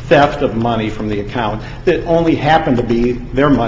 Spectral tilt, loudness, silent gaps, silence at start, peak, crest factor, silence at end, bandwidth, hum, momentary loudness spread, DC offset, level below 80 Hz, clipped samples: -7.5 dB/octave; -15 LUFS; none; 0 s; 0 dBFS; 14 dB; 0 s; 7.6 kHz; none; 8 LU; under 0.1%; -30 dBFS; under 0.1%